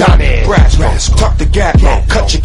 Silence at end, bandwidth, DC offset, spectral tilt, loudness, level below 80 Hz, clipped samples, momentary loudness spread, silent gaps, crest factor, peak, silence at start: 0 s; 11.5 kHz; under 0.1%; -5 dB/octave; -10 LUFS; -10 dBFS; 0.6%; 3 LU; none; 8 dB; 0 dBFS; 0 s